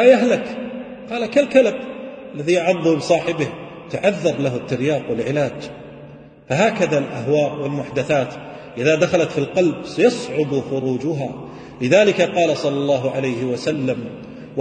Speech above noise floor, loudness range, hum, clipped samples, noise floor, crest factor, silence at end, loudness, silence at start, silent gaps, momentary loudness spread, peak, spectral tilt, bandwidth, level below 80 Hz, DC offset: 22 dB; 3 LU; none; under 0.1%; -41 dBFS; 18 dB; 0 s; -19 LUFS; 0 s; none; 17 LU; 0 dBFS; -6 dB/octave; 9.4 kHz; -56 dBFS; under 0.1%